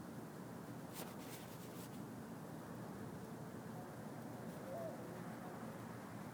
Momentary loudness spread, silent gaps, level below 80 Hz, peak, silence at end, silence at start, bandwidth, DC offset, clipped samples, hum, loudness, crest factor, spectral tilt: 3 LU; none; -78 dBFS; -36 dBFS; 0 s; 0 s; 19 kHz; under 0.1%; under 0.1%; none; -51 LUFS; 16 dB; -6 dB/octave